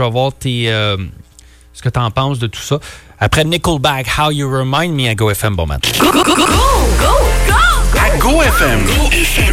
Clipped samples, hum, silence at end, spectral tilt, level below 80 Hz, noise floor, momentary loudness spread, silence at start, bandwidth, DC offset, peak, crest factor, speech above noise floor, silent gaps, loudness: under 0.1%; none; 0 s; -4 dB/octave; -18 dBFS; -42 dBFS; 9 LU; 0 s; 16.5 kHz; under 0.1%; -2 dBFS; 12 dB; 29 dB; none; -13 LUFS